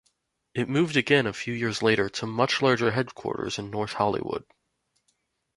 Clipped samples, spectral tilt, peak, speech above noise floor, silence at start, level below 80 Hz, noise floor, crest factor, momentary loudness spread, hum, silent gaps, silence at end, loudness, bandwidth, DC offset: under 0.1%; -5 dB/octave; -6 dBFS; 49 dB; 0.55 s; -60 dBFS; -75 dBFS; 20 dB; 10 LU; none; none; 1.15 s; -26 LUFS; 11.5 kHz; under 0.1%